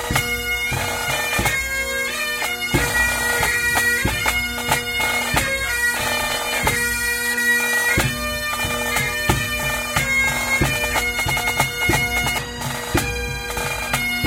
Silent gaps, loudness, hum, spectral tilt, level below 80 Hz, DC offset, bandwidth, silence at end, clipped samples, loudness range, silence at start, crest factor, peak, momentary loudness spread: none; -19 LUFS; none; -2.5 dB/octave; -34 dBFS; under 0.1%; 17 kHz; 0 s; under 0.1%; 1 LU; 0 s; 20 dB; -2 dBFS; 5 LU